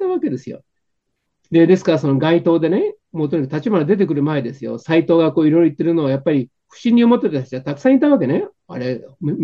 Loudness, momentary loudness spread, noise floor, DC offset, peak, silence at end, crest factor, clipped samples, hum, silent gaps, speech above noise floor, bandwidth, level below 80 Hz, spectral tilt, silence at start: -17 LUFS; 12 LU; -74 dBFS; under 0.1%; -2 dBFS; 0 s; 14 dB; under 0.1%; none; none; 58 dB; 7.2 kHz; -64 dBFS; -8.5 dB/octave; 0 s